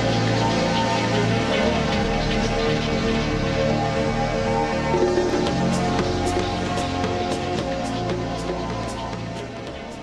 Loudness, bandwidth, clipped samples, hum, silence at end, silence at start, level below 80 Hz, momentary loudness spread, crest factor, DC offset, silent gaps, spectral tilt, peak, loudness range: -23 LUFS; 12.5 kHz; under 0.1%; none; 0 s; 0 s; -36 dBFS; 7 LU; 14 dB; under 0.1%; none; -5.5 dB/octave; -8 dBFS; 4 LU